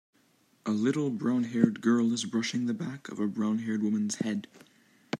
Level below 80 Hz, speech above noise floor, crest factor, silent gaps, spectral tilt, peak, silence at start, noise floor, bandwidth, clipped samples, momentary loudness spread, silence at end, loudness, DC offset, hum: -78 dBFS; 38 dB; 22 dB; none; -5.5 dB/octave; -8 dBFS; 0.65 s; -67 dBFS; 11.5 kHz; under 0.1%; 8 LU; 0.05 s; -30 LUFS; under 0.1%; none